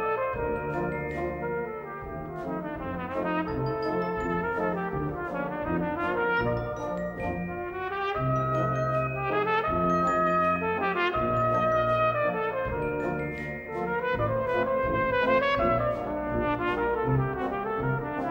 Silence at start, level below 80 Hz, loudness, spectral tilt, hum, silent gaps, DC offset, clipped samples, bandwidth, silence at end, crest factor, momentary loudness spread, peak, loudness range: 0 s; -46 dBFS; -28 LUFS; -8 dB/octave; none; none; under 0.1%; under 0.1%; 16 kHz; 0 s; 16 dB; 9 LU; -12 dBFS; 6 LU